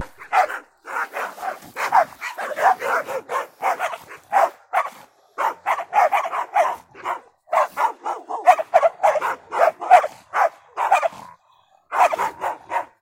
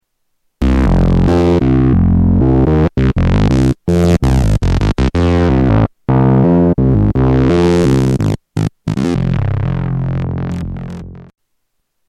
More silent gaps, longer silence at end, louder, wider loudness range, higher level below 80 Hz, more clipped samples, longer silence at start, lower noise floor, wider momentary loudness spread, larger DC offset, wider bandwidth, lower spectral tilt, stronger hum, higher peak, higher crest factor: neither; second, 0.15 s vs 0.85 s; second, -21 LUFS vs -13 LUFS; about the same, 4 LU vs 6 LU; second, -70 dBFS vs -20 dBFS; neither; second, 0 s vs 0.6 s; second, -58 dBFS vs -67 dBFS; first, 13 LU vs 8 LU; neither; first, 16.5 kHz vs 11 kHz; second, -2 dB/octave vs -8.5 dB/octave; neither; about the same, 0 dBFS vs 0 dBFS; first, 22 dB vs 12 dB